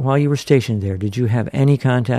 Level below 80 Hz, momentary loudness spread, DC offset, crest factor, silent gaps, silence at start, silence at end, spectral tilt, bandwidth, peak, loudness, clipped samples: -52 dBFS; 6 LU; under 0.1%; 14 dB; none; 0 s; 0 s; -7.5 dB/octave; 13 kHz; -2 dBFS; -18 LUFS; under 0.1%